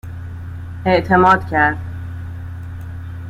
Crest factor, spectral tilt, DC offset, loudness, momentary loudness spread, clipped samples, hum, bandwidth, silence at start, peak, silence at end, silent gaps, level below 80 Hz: 18 dB; -7.5 dB/octave; under 0.1%; -15 LUFS; 19 LU; under 0.1%; none; 12 kHz; 0.05 s; -2 dBFS; 0 s; none; -40 dBFS